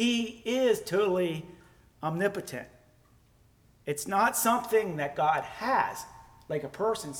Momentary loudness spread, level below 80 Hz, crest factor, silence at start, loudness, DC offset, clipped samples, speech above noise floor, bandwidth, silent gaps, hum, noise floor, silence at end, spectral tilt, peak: 14 LU; -64 dBFS; 18 dB; 0 s; -29 LUFS; under 0.1%; under 0.1%; 33 dB; over 20 kHz; none; none; -62 dBFS; 0 s; -4 dB/octave; -12 dBFS